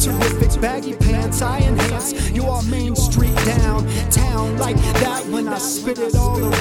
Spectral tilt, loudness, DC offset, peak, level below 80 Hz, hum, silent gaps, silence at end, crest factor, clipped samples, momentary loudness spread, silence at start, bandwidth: -5 dB/octave; -19 LUFS; under 0.1%; 0 dBFS; -22 dBFS; none; none; 0 s; 16 dB; under 0.1%; 4 LU; 0 s; 18 kHz